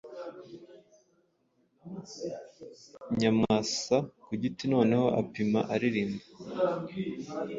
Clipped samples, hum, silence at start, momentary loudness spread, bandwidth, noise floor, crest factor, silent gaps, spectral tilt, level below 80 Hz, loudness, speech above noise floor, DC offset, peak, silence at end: under 0.1%; none; 0.05 s; 22 LU; 7.8 kHz; -72 dBFS; 20 dB; none; -5.5 dB/octave; -64 dBFS; -30 LUFS; 42 dB; under 0.1%; -12 dBFS; 0 s